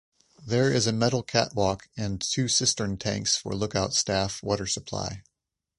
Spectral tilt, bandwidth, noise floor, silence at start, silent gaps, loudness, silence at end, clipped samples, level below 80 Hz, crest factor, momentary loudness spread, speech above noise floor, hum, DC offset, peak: -3.5 dB/octave; 11.5 kHz; -84 dBFS; 0.4 s; none; -26 LUFS; 0.6 s; under 0.1%; -50 dBFS; 20 dB; 10 LU; 57 dB; none; under 0.1%; -8 dBFS